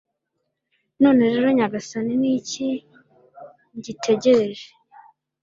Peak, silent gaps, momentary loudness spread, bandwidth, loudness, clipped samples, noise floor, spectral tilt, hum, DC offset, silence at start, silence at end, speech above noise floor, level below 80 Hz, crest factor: -4 dBFS; none; 18 LU; 7.6 kHz; -20 LUFS; under 0.1%; -77 dBFS; -5 dB/octave; none; under 0.1%; 1 s; 0.75 s; 57 dB; -64 dBFS; 18 dB